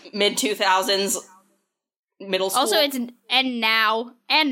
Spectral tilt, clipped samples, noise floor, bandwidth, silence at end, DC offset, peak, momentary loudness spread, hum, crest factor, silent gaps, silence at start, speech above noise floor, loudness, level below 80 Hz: -1.5 dB/octave; under 0.1%; -71 dBFS; 17 kHz; 0 s; under 0.1%; -4 dBFS; 8 LU; none; 18 dB; 1.99-2.03 s; 0.05 s; 50 dB; -21 LUFS; -80 dBFS